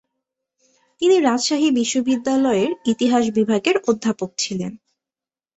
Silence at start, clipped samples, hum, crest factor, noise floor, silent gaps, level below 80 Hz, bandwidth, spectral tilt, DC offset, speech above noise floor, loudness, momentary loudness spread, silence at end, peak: 1 s; under 0.1%; none; 18 dB; under -90 dBFS; none; -62 dBFS; 8.2 kHz; -4 dB/octave; under 0.1%; over 71 dB; -19 LUFS; 7 LU; 0.8 s; -2 dBFS